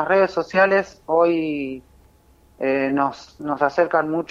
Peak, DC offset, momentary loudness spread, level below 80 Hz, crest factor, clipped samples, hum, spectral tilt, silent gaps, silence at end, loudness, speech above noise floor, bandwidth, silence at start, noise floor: -4 dBFS; under 0.1%; 11 LU; -56 dBFS; 18 dB; under 0.1%; none; -6.5 dB/octave; none; 0.05 s; -20 LUFS; 34 dB; 7.6 kHz; 0 s; -54 dBFS